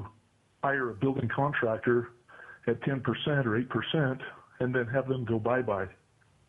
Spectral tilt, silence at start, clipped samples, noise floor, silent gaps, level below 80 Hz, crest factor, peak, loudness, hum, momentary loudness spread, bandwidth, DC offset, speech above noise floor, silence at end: -8.5 dB/octave; 0 s; under 0.1%; -65 dBFS; none; -64 dBFS; 16 dB; -14 dBFS; -30 LUFS; none; 10 LU; 3.9 kHz; under 0.1%; 36 dB; 0.55 s